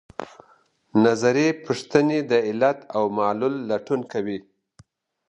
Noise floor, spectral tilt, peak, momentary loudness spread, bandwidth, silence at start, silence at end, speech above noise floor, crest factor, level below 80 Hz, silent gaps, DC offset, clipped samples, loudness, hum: -59 dBFS; -6 dB/octave; -4 dBFS; 12 LU; 11 kHz; 0.2 s; 0.9 s; 38 dB; 20 dB; -64 dBFS; none; under 0.1%; under 0.1%; -22 LUFS; none